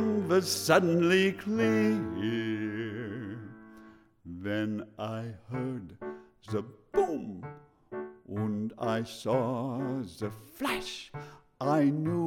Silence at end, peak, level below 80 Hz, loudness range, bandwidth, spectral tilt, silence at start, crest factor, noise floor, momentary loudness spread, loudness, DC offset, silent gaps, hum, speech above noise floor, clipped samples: 0 s; -10 dBFS; -64 dBFS; 9 LU; 17 kHz; -5.5 dB/octave; 0 s; 22 dB; -55 dBFS; 18 LU; -31 LUFS; under 0.1%; none; none; 25 dB; under 0.1%